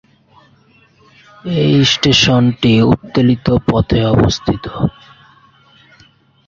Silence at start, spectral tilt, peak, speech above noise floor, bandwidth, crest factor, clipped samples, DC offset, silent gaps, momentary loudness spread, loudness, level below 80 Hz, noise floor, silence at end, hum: 1.45 s; -5.5 dB/octave; 0 dBFS; 38 dB; 7.6 kHz; 14 dB; under 0.1%; under 0.1%; none; 10 LU; -13 LUFS; -34 dBFS; -50 dBFS; 1.55 s; none